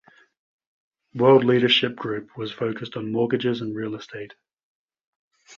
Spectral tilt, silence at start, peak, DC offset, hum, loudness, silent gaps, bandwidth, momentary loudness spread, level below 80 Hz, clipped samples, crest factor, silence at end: -6.5 dB/octave; 1.15 s; -4 dBFS; under 0.1%; none; -22 LUFS; 4.63-4.88 s, 5.07-5.31 s; 7.2 kHz; 19 LU; -66 dBFS; under 0.1%; 20 dB; 0.05 s